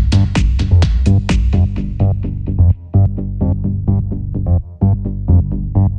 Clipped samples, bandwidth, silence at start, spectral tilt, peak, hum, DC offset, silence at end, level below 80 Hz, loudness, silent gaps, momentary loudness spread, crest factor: under 0.1%; 8.6 kHz; 0 s; -8 dB/octave; -2 dBFS; none; under 0.1%; 0 s; -18 dBFS; -16 LUFS; none; 6 LU; 12 dB